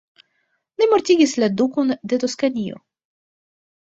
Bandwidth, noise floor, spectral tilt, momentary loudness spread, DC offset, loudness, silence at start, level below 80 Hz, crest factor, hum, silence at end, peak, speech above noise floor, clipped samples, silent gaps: 8.2 kHz; -70 dBFS; -4.5 dB/octave; 11 LU; under 0.1%; -19 LUFS; 0.8 s; -64 dBFS; 18 dB; none; 1.05 s; -4 dBFS; 52 dB; under 0.1%; none